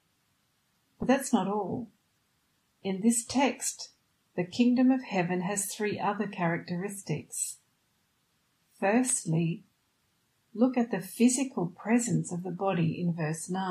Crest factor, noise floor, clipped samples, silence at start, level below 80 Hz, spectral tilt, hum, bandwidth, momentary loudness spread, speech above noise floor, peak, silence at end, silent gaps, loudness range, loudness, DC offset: 18 dB; -73 dBFS; under 0.1%; 1 s; -68 dBFS; -5 dB/octave; none; 15 kHz; 11 LU; 44 dB; -12 dBFS; 0 s; none; 4 LU; -29 LUFS; under 0.1%